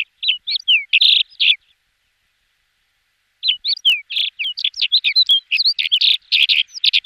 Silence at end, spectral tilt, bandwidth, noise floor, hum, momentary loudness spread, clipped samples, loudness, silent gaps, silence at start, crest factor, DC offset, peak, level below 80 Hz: 0.05 s; 5 dB/octave; 16 kHz; -66 dBFS; none; 8 LU; under 0.1%; -14 LUFS; none; 0 s; 16 dB; under 0.1%; -2 dBFS; -72 dBFS